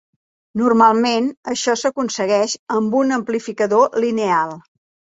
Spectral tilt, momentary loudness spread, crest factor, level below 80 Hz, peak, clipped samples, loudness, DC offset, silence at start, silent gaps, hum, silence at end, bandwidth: -4 dB/octave; 9 LU; 16 dB; -62 dBFS; -2 dBFS; under 0.1%; -18 LUFS; under 0.1%; 0.55 s; 1.37-1.43 s, 2.59-2.66 s; none; 0.55 s; 8 kHz